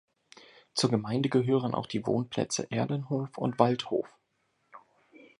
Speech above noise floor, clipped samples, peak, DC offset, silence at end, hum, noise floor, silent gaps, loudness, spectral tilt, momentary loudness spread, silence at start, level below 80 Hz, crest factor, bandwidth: 46 dB; under 0.1%; -6 dBFS; under 0.1%; 0.6 s; none; -75 dBFS; none; -30 LUFS; -5.5 dB/octave; 7 LU; 0.75 s; -68 dBFS; 24 dB; 11.5 kHz